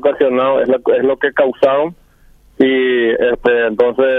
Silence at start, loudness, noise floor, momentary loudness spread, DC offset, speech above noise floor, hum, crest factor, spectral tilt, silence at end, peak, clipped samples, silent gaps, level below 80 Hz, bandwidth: 0 s; -14 LUFS; -47 dBFS; 2 LU; under 0.1%; 34 dB; none; 12 dB; -7 dB/octave; 0 s; 0 dBFS; under 0.1%; none; -48 dBFS; 4.6 kHz